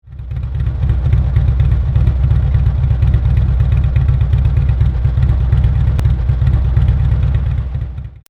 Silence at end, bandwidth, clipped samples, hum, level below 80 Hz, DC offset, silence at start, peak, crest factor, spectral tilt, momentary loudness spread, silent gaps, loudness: 0.15 s; 4.3 kHz; under 0.1%; none; -16 dBFS; under 0.1%; 0.05 s; 0 dBFS; 12 dB; -9.5 dB/octave; 6 LU; none; -15 LUFS